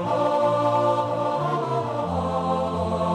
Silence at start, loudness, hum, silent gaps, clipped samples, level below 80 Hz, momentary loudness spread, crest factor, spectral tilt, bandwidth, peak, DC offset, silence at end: 0 s; -23 LUFS; none; none; under 0.1%; -50 dBFS; 5 LU; 14 dB; -7 dB/octave; 11.5 kHz; -10 dBFS; under 0.1%; 0 s